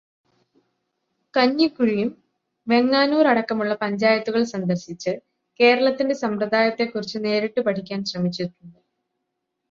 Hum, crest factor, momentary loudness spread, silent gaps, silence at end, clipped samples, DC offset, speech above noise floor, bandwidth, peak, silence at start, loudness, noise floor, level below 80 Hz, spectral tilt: none; 18 dB; 11 LU; none; 1 s; under 0.1%; under 0.1%; 58 dB; 7.4 kHz; -4 dBFS; 1.35 s; -21 LUFS; -79 dBFS; -68 dBFS; -5.5 dB/octave